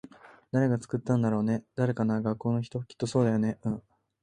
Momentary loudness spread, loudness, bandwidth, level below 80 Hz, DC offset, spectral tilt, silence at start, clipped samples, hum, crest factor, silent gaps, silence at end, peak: 8 LU; -29 LUFS; 10 kHz; -62 dBFS; under 0.1%; -8 dB/octave; 0.55 s; under 0.1%; none; 16 dB; none; 0.45 s; -12 dBFS